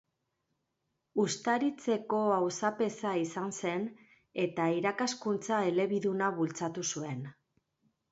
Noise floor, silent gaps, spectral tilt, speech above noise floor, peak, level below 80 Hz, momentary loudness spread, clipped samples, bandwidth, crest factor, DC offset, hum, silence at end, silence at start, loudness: -83 dBFS; none; -4.5 dB/octave; 51 dB; -16 dBFS; -78 dBFS; 8 LU; under 0.1%; 8.2 kHz; 18 dB; under 0.1%; none; 0.8 s; 1.15 s; -32 LUFS